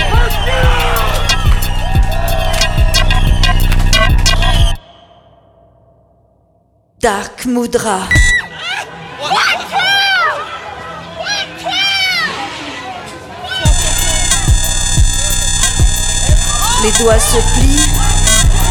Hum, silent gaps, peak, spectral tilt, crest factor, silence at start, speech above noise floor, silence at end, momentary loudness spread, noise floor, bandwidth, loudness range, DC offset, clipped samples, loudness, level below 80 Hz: none; none; 0 dBFS; -3 dB/octave; 12 dB; 0 s; 43 dB; 0 s; 12 LU; -54 dBFS; 18.5 kHz; 5 LU; under 0.1%; under 0.1%; -12 LUFS; -14 dBFS